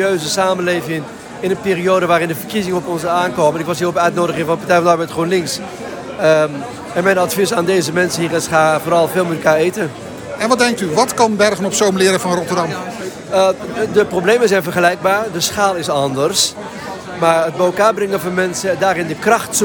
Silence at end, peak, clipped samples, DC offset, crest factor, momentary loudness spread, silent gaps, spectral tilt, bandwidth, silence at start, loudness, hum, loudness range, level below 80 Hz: 0 s; 0 dBFS; under 0.1%; under 0.1%; 14 dB; 10 LU; none; -4 dB/octave; over 20 kHz; 0 s; -15 LUFS; none; 1 LU; -52 dBFS